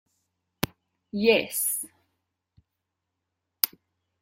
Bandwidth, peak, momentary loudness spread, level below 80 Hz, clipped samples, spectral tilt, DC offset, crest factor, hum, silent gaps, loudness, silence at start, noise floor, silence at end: 16.5 kHz; 0 dBFS; 12 LU; -62 dBFS; under 0.1%; -2.5 dB/octave; under 0.1%; 32 dB; none; none; -26 LUFS; 1.15 s; -83 dBFS; 0.55 s